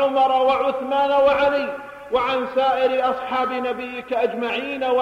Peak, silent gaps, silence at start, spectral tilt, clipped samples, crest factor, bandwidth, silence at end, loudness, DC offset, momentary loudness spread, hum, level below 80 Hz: -8 dBFS; none; 0 s; -4.5 dB/octave; under 0.1%; 12 dB; 7.6 kHz; 0 s; -21 LUFS; under 0.1%; 9 LU; none; -56 dBFS